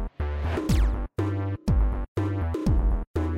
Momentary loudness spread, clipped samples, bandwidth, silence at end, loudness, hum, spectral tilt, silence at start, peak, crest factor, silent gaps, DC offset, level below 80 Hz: 4 LU; under 0.1%; 12 kHz; 0 s; -27 LUFS; none; -7.5 dB/octave; 0 s; -12 dBFS; 12 dB; 2.08-2.15 s, 3.07-3.14 s; under 0.1%; -28 dBFS